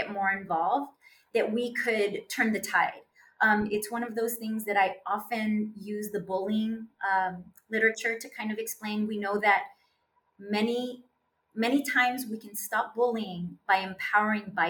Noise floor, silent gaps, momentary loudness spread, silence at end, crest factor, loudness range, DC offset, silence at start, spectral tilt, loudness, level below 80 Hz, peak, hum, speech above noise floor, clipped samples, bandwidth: -73 dBFS; none; 10 LU; 0 s; 18 dB; 2 LU; under 0.1%; 0 s; -4 dB/octave; -29 LUFS; -72 dBFS; -12 dBFS; none; 44 dB; under 0.1%; 18 kHz